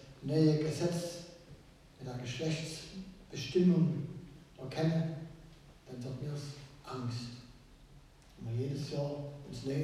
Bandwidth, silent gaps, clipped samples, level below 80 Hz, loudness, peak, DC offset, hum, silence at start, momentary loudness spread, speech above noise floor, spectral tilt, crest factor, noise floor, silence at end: 13.5 kHz; none; under 0.1%; -62 dBFS; -36 LUFS; -16 dBFS; under 0.1%; none; 0 s; 21 LU; 24 dB; -7 dB/octave; 20 dB; -58 dBFS; 0 s